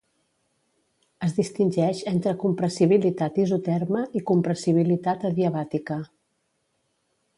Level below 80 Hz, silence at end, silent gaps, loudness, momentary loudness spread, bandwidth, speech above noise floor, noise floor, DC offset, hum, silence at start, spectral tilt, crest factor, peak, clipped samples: -66 dBFS; 1.3 s; none; -24 LUFS; 8 LU; 11.5 kHz; 50 dB; -73 dBFS; under 0.1%; none; 1.2 s; -7.5 dB/octave; 18 dB; -6 dBFS; under 0.1%